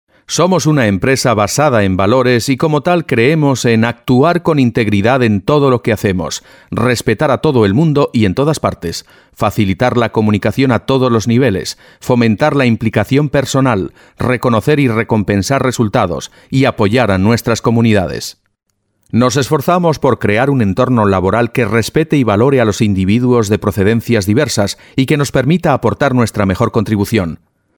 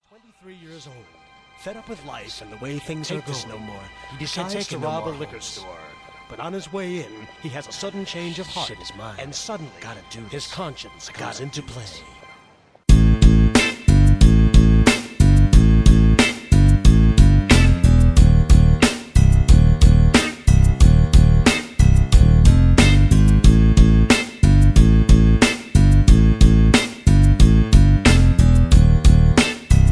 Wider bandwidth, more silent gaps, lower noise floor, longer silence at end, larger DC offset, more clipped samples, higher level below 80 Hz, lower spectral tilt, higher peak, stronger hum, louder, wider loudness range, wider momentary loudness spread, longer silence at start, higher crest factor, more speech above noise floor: first, 19.5 kHz vs 11 kHz; neither; first, -66 dBFS vs -52 dBFS; first, 0.45 s vs 0 s; neither; neither; second, -42 dBFS vs -18 dBFS; about the same, -6 dB/octave vs -6 dB/octave; about the same, 0 dBFS vs 0 dBFS; neither; about the same, -13 LUFS vs -15 LUFS; second, 2 LU vs 18 LU; second, 6 LU vs 20 LU; second, 0.3 s vs 1.65 s; about the same, 12 dB vs 14 dB; first, 54 dB vs 20 dB